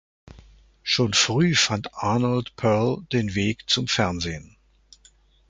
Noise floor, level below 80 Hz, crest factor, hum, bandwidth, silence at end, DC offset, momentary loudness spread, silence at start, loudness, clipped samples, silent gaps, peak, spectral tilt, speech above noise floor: -57 dBFS; -48 dBFS; 18 dB; none; 9.6 kHz; 1.1 s; under 0.1%; 9 LU; 0.85 s; -22 LUFS; under 0.1%; none; -6 dBFS; -4 dB/octave; 34 dB